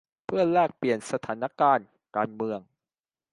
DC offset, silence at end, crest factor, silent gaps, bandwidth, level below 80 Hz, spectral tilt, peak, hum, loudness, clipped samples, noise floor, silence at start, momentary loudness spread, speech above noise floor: under 0.1%; 0.7 s; 18 dB; none; 11.5 kHz; -70 dBFS; -6 dB/octave; -8 dBFS; none; -27 LUFS; under 0.1%; under -90 dBFS; 0.3 s; 10 LU; over 64 dB